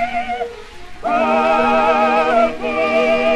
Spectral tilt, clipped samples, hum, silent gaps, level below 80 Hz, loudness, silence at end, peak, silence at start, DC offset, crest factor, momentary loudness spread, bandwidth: -4.5 dB/octave; under 0.1%; none; none; -42 dBFS; -16 LUFS; 0 s; -4 dBFS; 0 s; under 0.1%; 12 dB; 12 LU; 11 kHz